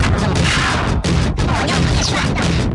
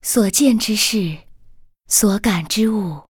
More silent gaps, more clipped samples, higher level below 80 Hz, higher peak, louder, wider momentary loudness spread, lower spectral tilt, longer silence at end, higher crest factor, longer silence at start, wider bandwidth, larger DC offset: neither; neither; first, -24 dBFS vs -44 dBFS; about the same, -2 dBFS vs -2 dBFS; about the same, -16 LUFS vs -17 LUFS; second, 3 LU vs 9 LU; first, -5 dB/octave vs -3.5 dB/octave; about the same, 0 s vs 0.1 s; about the same, 12 dB vs 16 dB; about the same, 0 s vs 0.05 s; second, 11.5 kHz vs over 20 kHz; neither